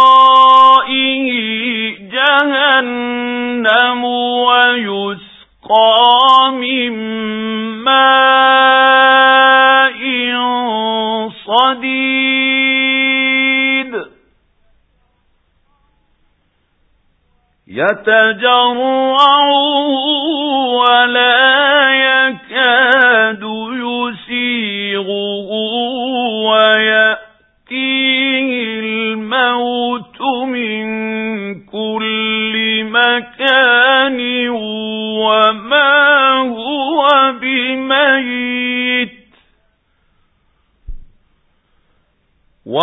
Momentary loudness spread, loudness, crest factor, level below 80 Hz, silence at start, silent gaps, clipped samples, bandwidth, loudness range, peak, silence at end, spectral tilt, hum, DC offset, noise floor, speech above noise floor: 12 LU; -11 LUFS; 14 dB; -50 dBFS; 0 s; none; under 0.1%; 8 kHz; 8 LU; 0 dBFS; 0 s; -5 dB/octave; none; under 0.1%; -60 dBFS; 48 dB